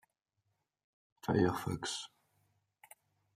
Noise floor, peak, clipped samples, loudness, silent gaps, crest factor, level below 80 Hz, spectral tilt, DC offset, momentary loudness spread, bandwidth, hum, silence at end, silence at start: -84 dBFS; -18 dBFS; under 0.1%; -36 LUFS; none; 22 dB; -68 dBFS; -5 dB/octave; under 0.1%; 13 LU; 15 kHz; none; 1.3 s; 1.25 s